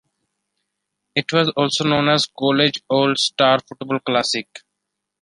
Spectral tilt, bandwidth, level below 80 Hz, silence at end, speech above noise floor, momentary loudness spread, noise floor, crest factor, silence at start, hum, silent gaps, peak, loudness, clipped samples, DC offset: -4 dB/octave; 11.5 kHz; -62 dBFS; 0.65 s; 61 dB; 8 LU; -79 dBFS; 20 dB; 1.15 s; none; none; -2 dBFS; -18 LUFS; under 0.1%; under 0.1%